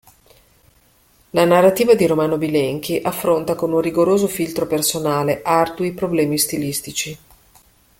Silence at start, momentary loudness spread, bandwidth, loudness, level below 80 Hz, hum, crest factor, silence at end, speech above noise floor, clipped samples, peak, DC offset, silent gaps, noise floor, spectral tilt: 1.35 s; 9 LU; 17 kHz; -18 LUFS; -54 dBFS; none; 18 dB; 0.85 s; 38 dB; under 0.1%; -2 dBFS; under 0.1%; none; -56 dBFS; -4.5 dB/octave